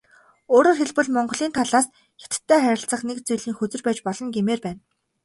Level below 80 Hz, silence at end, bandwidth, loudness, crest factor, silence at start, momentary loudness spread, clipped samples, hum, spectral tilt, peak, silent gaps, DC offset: -64 dBFS; 0.45 s; 12 kHz; -22 LUFS; 18 dB; 0.5 s; 10 LU; under 0.1%; none; -4 dB/octave; -4 dBFS; none; under 0.1%